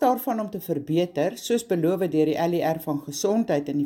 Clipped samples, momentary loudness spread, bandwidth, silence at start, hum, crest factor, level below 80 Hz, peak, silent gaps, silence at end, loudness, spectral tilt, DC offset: under 0.1%; 6 LU; 17 kHz; 0 s; none; 14 dB; -66 dBFS; -10 dBFS; none; 0 s; -25 LUFS; -6 dB/octave; under 0.1%